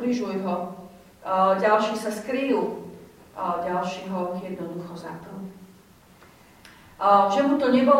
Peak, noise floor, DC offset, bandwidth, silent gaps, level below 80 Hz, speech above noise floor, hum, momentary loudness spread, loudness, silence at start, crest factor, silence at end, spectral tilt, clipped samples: -6 dBFS; -53 dBFS; under 0.1%; 16 kHz; none; -64 dBFS; 29 dB; none; 20 LU; -24 LUFS; 0 s; 20 dB; 0 s; -6 dB/octave; under 0.1%